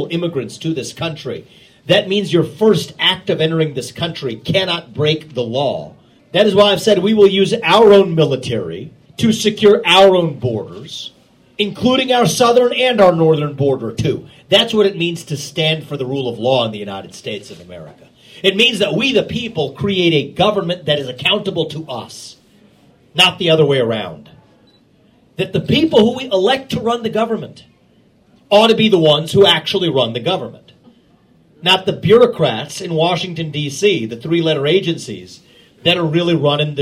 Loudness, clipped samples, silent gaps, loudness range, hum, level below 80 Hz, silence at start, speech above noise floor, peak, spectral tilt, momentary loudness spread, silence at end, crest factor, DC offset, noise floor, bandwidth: -14 LUFS; under 0.1%; none; 5 LU; none; -52 dBFS; 0 s; 37 dB; 0 dBFS; -5 dB/octave; 16 LU; 0 s; 16 dB; under 0.1%; -52 dBFS; 15.5 kHz